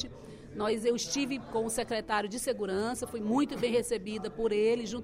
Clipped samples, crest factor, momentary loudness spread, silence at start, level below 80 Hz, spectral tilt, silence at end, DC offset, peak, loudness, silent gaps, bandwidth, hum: under 0.1%; 14 dB; 6 LU; 0 s; -58 dBFS; -4 dB/octave; 0 s; under 0.1%; -16 dBFS; -32 LUFS; none; 16 kHz; none